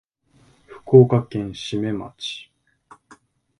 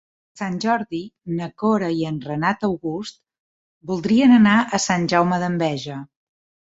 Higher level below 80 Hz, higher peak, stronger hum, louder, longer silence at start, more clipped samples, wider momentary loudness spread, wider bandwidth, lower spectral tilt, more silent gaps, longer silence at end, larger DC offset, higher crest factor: about the same, -56 dBFS vs -58 dBFS; first, 0 dBFS vs -4 dBFS; neither; about the same, -20 LUFS vs -20 LUFS; first, 0.7 s vs 0.35 s; neither; about the same, 17 LU vs 17 LU; first, 10.5 kHz vs 8 kHz; first, -7.5 dB/octave vs -5.5 dB/octave; second, none vs 3.39-3.81 s; first, 1.2 s vs 0.6 s; neither; about the same, 22 dB vs 18 dB